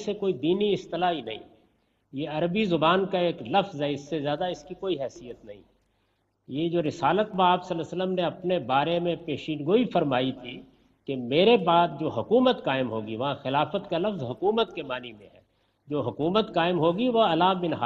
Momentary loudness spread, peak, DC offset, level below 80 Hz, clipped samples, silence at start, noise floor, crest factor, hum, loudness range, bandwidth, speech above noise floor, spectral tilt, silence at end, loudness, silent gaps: 13 LU; -8 dBFS; under 0.1%; -64 dBFS; under 0.1%; 0 s; -72 dBFS; 18 dB; none; 5 LU; 7.8 kHz; 46 dB; -7 dB/octave; 0 s; -26 LUFS; none